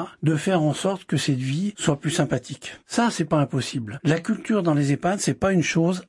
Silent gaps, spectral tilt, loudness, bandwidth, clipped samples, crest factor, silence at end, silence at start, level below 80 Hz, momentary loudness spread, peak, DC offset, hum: none; -5.5 dB/octave; -23 LUFS; 11.5 kHz; under 0.1%; 18 dB; 0.05 s; 0 s; -58 dBFS; 5 LU; -6 dBFS; under 0.1%; none